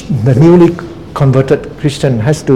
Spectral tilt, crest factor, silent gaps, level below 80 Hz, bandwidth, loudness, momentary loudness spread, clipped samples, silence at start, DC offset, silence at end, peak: -8 dB/octave; 10 dB; none; -36 dBFS; 12 kHz; -10 LUFS; 11 LU; 1%; 0 s; 0.8%; 0 s; 0 dBFS